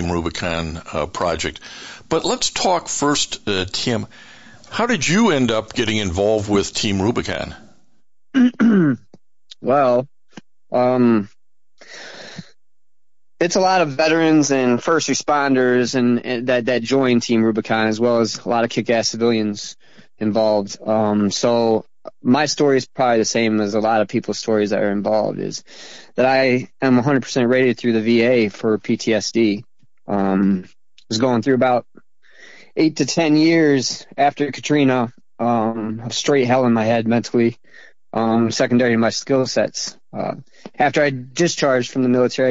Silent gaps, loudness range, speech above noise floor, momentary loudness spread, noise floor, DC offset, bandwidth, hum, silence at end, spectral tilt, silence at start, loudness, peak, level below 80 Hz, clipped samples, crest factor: none; 3 LU; 69 dB; 11 LU; -86 dBFS; 0.5%; 8.2 kHz; none; 0 s; -4.5 dB/octave; 0 s; -18 LUFS; -6 dBFS; -52 dBFS; under 0.1%; 12 dB